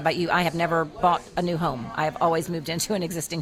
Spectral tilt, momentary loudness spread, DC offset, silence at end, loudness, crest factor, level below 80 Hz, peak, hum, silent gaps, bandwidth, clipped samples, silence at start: -4.5 dB/octave; 5 LU; under 0.1%; 0 s; -25 LUFS; 18 dB; -52 dBFS; -8 dBFS; none; none; 16 kHz; under 0.1%; 0 s